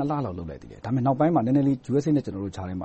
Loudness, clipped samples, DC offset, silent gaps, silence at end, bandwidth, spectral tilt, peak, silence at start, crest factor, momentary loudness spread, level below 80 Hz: -25 LUFS; under 0.1%; under 0.1%; none; 0 s; 8.4 kHz; -9 dB/octave; -10 dBFS; 0 s; 14 dB; 14 LU; -52 dBFS